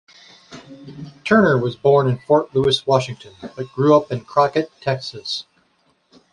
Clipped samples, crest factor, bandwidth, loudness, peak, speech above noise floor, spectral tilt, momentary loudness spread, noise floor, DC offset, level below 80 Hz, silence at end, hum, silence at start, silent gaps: under 0.1%; 18 dB; 11 kHz; -18 LUFS; -2 dBFS; 44 dB; -6 dB/octave; 19 LU; -62 dBFS; under 0.1%; -56 dBFS; 0.9 s; none; 0.5 s; none